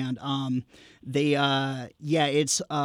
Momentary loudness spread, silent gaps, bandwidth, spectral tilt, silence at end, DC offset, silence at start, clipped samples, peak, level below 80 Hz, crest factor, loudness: 9 LU; none; 16.5 kHz; -4 dB/octave; 0 s; under 0.1%; 0 s; under 0.1%; -12 dBFS; -68 dBFS; 14 dB; -26 LUFS